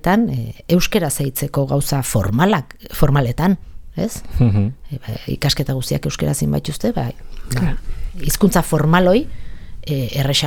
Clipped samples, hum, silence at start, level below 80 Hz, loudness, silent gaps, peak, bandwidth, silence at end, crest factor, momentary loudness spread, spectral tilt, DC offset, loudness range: under 0.1%; none; 0.05 s; -30 dBFS; -18 LUFS; none; 0 dBFS; 19 kHz; 0 s; 18 dB; 12 LU; -5.5 dB/octave; under 0.1%; 3 LU